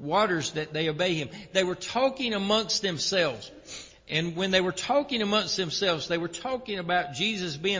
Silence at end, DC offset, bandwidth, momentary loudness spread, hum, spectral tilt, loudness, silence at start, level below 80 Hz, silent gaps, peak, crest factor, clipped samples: 0 s; under 0.1%; 7.8 kHz; 7 LU; none; -3.5 dB/octave; -27 LUFS; 0 s; -60 dBFS; none; -10 dBFS; 18 dB; under 0.1%